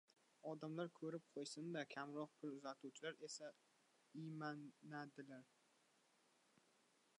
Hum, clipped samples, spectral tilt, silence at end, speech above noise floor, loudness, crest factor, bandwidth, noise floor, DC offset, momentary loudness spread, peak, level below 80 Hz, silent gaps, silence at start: none; under 0.1%; -5 dB/octave; 1.75 s; 27 dB; -53 LUFS; 18 dB; 11 kHz; -79 dBFS; under 0.1%; 8 LU; -36 dBFS; under -90 dBFS; none; 0.45 s